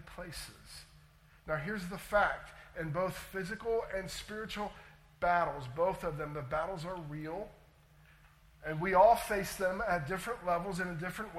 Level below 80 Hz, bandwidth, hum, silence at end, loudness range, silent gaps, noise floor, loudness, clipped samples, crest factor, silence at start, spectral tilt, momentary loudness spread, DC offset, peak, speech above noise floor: -56 dBFS; 16.5 kHz; none; 0 s; 5 LU; none; -62 dBFS; -35 LUFS; under 0.1%; 22 dB; 0 s; -5 dB/octave; 15 LU; under 0.1%; -14 dBFS; 27 dB